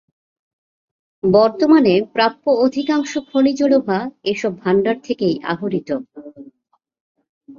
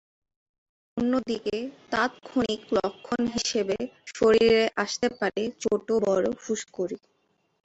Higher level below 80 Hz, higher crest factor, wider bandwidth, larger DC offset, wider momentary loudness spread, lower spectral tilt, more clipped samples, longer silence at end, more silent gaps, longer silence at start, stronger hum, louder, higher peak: about the same, -60 dBFS vs -58 dBFS; about the same, 16 dB vs 18 dB; second, 7.4 kHz vs 8.2 kHz; neither; about the same, 10 LU vs 11 LU; first, -6 dB/octave vs -4 dB/octave; neither; second, 0.05 s vs 0.7 s; first, 7.00-7.15 s, 7.29-7.41 s vs none; first, 1.25 s vs 0.95 s; neither; first, -17 LUFS vs -26 LUFS; first, -2 dBFS vs -10 dBFS